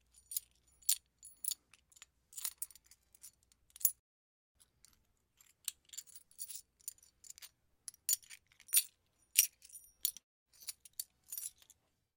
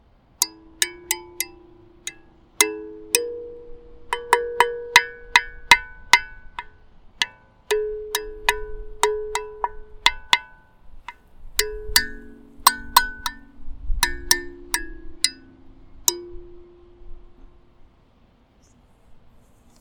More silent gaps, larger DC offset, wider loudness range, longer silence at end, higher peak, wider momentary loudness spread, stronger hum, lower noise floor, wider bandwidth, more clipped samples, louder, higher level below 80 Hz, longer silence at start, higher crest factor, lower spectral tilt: first, 3.99-4.55 s, 10.23-10.46 s vs none; neither; first, 14 LU vs 9 LU; about the same, 0.65 s vs 0.65 s; second, -6 dBFS vs 0 dBFS; first, 25 LU vs 20 LU; first, 60 Hz at -95 dBFS vs none; first, -75 dBFS vs -57 dBFS; second, 17 kHz vs 19 kHz; neither; second, -38 LUFS vs -22 LUFS; second, -82 dBFS vs -40 dBFS; about the same, 0.3 s vs 0.4 s; first, 38 dB vs 26 dB; second, 4.5 dB/octave vs 0 dB/octave